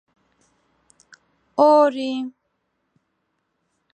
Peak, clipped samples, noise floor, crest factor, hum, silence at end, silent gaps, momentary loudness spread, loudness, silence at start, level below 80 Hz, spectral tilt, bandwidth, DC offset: -4 dBFS; under 0.1%; -73 dBFS; 20 dB; none; 1.65 s; none; 16 LU; -18 LUFS; 1.55 s; -80 dBFS; -4.5 dB/octave; 9 kHz; under 0.1%